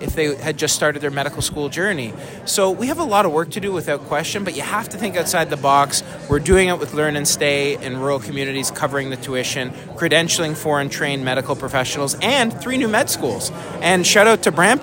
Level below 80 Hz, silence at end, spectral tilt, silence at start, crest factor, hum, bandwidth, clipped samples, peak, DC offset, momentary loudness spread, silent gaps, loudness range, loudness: -42 dBFS; 0 s; -3.5 dB/octave; 0 s; 18 dB; none; 16.5 kHz; under 0.1%; 0 dBFS; under 0.1%; 9 LU; none; 3 LU; -18 LUFS